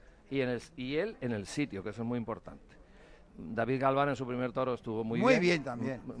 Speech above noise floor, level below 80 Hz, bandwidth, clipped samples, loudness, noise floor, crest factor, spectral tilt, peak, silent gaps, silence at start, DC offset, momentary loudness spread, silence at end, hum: 24 dB; -60 dBFS; 10.5 kHz; under 0.1%; -33 LUFS; -57 dBFS; 22 dB; -6 dB/octave; -10 dBFS; none; 0.3 s; under 0.1%; 12 LU; 0 s; none